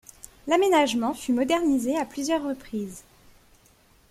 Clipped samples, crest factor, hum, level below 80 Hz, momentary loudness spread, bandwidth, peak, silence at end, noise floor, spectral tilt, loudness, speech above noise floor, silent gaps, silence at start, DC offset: under 0.1%; 18 dB; none; -58 dBFS; 17 LU; 16 kHz; -8 dBFS; 1.1 s; -59 dBFS; -3.5 dB/octave; -25 LUFS; 35 dB; none; 0.45 s; under 0.1%